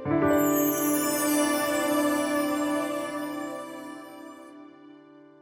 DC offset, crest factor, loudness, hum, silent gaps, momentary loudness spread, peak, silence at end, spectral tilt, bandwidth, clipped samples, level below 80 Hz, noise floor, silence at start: under 0.1%; 16 dB; -26 LUFS; none; none; 20 LU; -12 dBFS; 0.2 s; -4 dB/octave; over 20 kHz; under 0.1%; -62 dBFS; -51 dBFS; 0 s